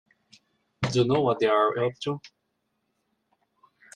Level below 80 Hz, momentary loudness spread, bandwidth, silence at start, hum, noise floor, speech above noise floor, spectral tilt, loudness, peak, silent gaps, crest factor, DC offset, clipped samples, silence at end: -64 dBFS; 11 LU; 10.5 kHz; 0.8 s; none; -77 dBFS; 53 dB; -6 dB/octave; -25 LUFS; -8 dBFS; none; 20 dB; under 0.1%; under 0.1%; 1.7 s